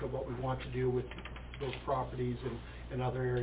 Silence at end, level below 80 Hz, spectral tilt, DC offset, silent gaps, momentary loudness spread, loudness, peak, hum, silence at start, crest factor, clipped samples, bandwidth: 0 s; -48 dBFS; -6.5 dB/octave; under 0.1%; none; 10 LU; -38 LUFS; -22 dBFS; none; 0 s; 14 dB; under 0.1%; 4 kHz